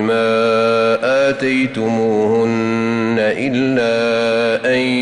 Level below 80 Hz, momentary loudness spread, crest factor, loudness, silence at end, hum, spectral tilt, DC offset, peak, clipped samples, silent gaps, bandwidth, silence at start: -56 dBFS; 3 LU; 8 dB; -15 LUFS; 0 s; none; -5.5 dB/octave; under 0.1%; -6 dBFS; under 0.1%; none; 11.5 kHz; 0 s